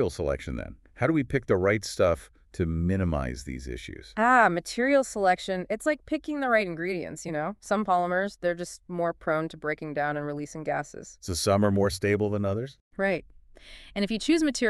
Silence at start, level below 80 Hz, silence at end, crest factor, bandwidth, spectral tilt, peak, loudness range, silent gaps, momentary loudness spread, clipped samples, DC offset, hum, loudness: 0 s; -46 dBFS; 0 s; 20 dB; 13.5 kHz; -5.5 dB/octave; -6 dBFS; 4 LU; 12.81-12.91 s; 12 LU; under 0.1%; under 0.1%; none; -27 LUFS